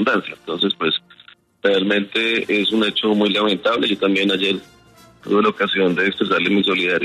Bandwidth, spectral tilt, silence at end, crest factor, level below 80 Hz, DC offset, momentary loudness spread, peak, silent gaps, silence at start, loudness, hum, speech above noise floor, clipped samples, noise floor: 13 kHz; -5.5 dB/octave; 0 s; 16 dB; -62 dBFS; under 0.1%; 5 LU; -4 dBFS; none; 0 s; -18 LUFS; none; 31 dB; under 0.1%; -49 dBFS